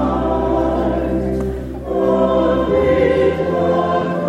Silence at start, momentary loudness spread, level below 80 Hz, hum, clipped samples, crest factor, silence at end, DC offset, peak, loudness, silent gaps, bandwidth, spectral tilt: 0 s; 7 LU; -30 dBFS; none; under 0.1%; 14 dB; 0 s; under 0.1%; -2 dBFS; -17 LUFS; none; 10.5 kHz; -8 dB/octave